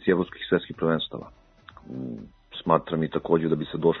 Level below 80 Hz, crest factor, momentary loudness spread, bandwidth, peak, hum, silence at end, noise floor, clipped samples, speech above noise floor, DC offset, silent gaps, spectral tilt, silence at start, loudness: -56 dBFS; 22 dB; 16 LU; 4.1 kHz; -4 dBFS; none; 0 s; -50 dBFS; under 0.1%; 25 dB; under 0.1%; none; -9.5 dB/octave; 0 s; -26 LUFS